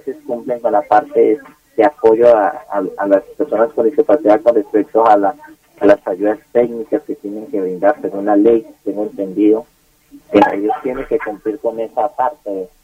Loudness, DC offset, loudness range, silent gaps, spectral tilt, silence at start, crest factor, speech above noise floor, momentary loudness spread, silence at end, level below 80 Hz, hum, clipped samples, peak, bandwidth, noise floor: -15 LUFS; under 0.1%; 4 LU; none; -7.5 dB/octave; 0.05 s; 14 dB; 30 dB; 11 LU; 0.2 s; -52 dBFS; none; under 0.1%; 0 dBFS; 15 kHz; -45 dBFS